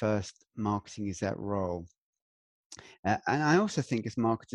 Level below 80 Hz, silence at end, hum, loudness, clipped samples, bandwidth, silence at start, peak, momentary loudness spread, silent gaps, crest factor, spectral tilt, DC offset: -62 dBFS; 0 s; none; -31 LUFS; under 0.1%; 11 kHz; 0 s; -12 dBFS; 16 LU; 1.98-2.13 s, 2.22-2.70 s, 2.99-3.03 s; 18 dB; -6 dB/octave; under 0.1%